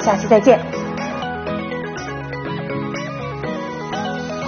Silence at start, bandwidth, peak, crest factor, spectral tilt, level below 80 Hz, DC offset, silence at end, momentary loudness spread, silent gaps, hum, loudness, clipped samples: 0 s; 6.8 kHz; 0 dBFS; 20 dB; -6 dB/octave; -48 dBFS; under 0.1%; 0 s; 13 LU; none; none; -21 LUFS; under 0.1%